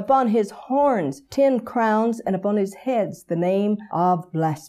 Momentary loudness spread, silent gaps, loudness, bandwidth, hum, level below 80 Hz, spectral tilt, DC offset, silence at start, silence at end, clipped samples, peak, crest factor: 5 LU; none; -22 LUFS; 14 kHz; none; -64 dBFS; -7.5 dB/octave; under 0.1%; 0 s; 0 s; under 0.1%; -8 dBFS; 14 dB